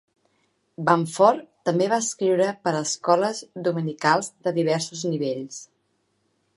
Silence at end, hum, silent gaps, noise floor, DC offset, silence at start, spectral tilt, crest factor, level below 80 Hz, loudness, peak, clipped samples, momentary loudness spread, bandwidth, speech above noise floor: 0.9 s; none; none; -70 dBFS; under 0.1%; 0.8 s; -4.5 dB/octave; 22 dB; -76 dBFS; -23 LUFS; -2 dBFS; under 0.1%; 8 LU; 11.5 kHz; 48 dB